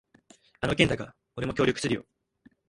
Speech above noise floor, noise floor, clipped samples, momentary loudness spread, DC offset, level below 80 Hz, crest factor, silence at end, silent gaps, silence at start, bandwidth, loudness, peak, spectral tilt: 35 dB; -62 dBFS; under 0.1%; 10 LU; under 0.1%; -50 dBFS; 26 dB; 0.65 s; none; 0.6 s; 11.5 kHz; -28 LUFS; -4 dBFS; -5 dB/octave